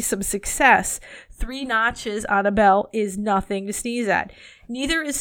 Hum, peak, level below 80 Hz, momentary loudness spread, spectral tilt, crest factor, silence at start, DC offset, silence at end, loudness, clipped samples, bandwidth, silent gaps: none; -2 dBFS; -40 dBFS; 15 LU; -3 dB/octave; 20 dB; 0 s; under 0.1%; 0 s; -21 LUFS; under 0.1%; 18.5 kHz; none